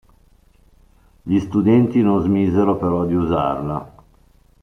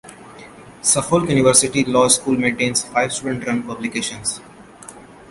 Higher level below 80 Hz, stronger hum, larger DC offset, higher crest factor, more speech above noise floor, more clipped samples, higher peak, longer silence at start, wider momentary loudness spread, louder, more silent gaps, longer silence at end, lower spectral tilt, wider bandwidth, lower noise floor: about the same, -46 dBFS vs -50 dBFS; neither; neither; about the same, 16 dB vs 20 dB; first, 36 dB vs 22 dB; neither; second, -4 dBFS vs 0 dBFS; first, 1.25 s vs 0.05 s; about the same, 10 LU vs 12 LU; about the same, -18 LUFS vs -17 LUFS; neither; first, 0.75 s vs 0.15 s; first, -9.5 dB/octave vs -3 dB/octave; second, 6.4 kHz vs 12 kHz; first, -53 dBFS vs -40 dBFS